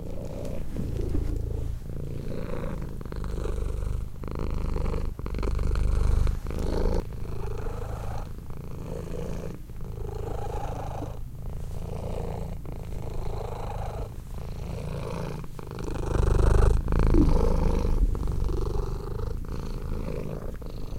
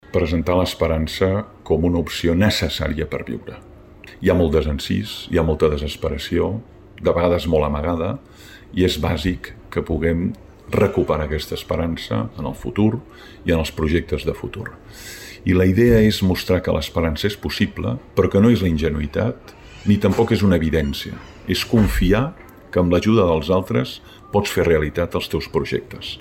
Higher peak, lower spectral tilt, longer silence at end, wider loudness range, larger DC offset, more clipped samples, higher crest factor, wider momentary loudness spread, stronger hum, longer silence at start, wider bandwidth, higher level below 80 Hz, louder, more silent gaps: second, -8 dBFS vs -4 dBFS; about the same, -7.5 dB/octave vs -6.5 dB/octave; about the same, 0 s vs 0 s; first, 10 LU vs 4 LU; neither; neither; about the same, 18 dB vs 16 dB; about the same, 12 LU vs 12 LU; neither; about the same, 0 s vs 0.1 s; second, 14.5 kHz vs 17 kHz; about the same, -28 dBFS vs -32 dBFS; second, -32 LUFS vs -20 LUFS; neither